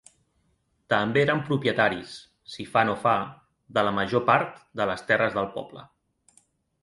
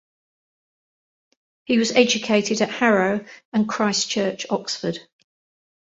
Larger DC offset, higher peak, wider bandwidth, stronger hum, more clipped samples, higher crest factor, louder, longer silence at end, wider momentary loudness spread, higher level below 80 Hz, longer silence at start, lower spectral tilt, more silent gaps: neither; second, -6 dBFS vs -2 dBFS; first, 11.5 kHz vs 8 kHz; neither; neither; about the same, 22 dB vs 20 dB; second, -25 LUFS vs -21 LUFS; first, 1 s vs 0.85 s; first, 16 LU vs 9 LU; first, -60 dBFS vs -66 dBFS; second, 0.9 s vs 1.7 s; first, -6 dB/octave vs -3.5 dB/octave; second, none vs 3.45-3.52 s